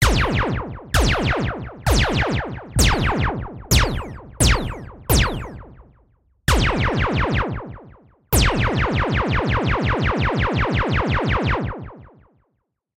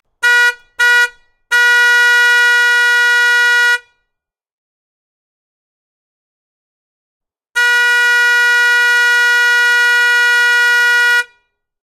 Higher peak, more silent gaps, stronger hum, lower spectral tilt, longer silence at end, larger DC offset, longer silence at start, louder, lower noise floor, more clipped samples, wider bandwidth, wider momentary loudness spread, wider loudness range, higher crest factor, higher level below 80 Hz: about the same, -4 dBFS vs -2 dBFS; second, none vs 4.53-7.20 s; neither; first, -4.5 dB/octave vs 5 dB/octave; first, 0.95 s vs 0.6 s; neither; second, 0 s vs 0.2 s; second, -20 LUFS vs -10 LUFS; second, -72 dBFS vs -76 dBFS; neither; about the same, 16 kHz vs 16.5 kHz; first, 12 LU vs 6 LU; second, 2 LU vs 9 LU; first, 18 dB vs 12 dB; first, -26 dBFS vs -62 dBFS